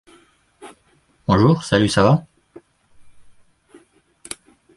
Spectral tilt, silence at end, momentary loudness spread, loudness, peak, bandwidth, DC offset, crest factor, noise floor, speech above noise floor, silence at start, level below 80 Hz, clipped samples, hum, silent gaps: -6 dB/octave; 1.65 s; 20 LU; -17 LUFS; -2 dBFS; 11.5 kHz; under 0.1%; 20 dB; -59 dBFS; 44 dB; 0.6 s; -46 dBFS; under 0.1%; none; none